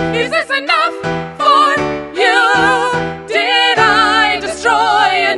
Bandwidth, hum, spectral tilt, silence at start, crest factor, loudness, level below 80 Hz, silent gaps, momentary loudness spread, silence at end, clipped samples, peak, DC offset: 11.5 kHz; none; -3 dB/octave; 0 s; 12 dB; -12 LUFS; -44 dBFS; none; 7 LU; 0 s; under 0.1%; 0 dBFS; under 0.1%